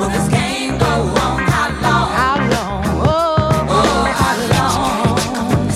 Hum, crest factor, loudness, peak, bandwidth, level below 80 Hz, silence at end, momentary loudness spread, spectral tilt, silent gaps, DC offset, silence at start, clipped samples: none; 14 dB; -15 LUFS; 0 dBFS; 16 kHz; -28 dBFS; 0 s; 3 LU; -5 dB/octave; none; under 0.1%; 0 s; under 0.1%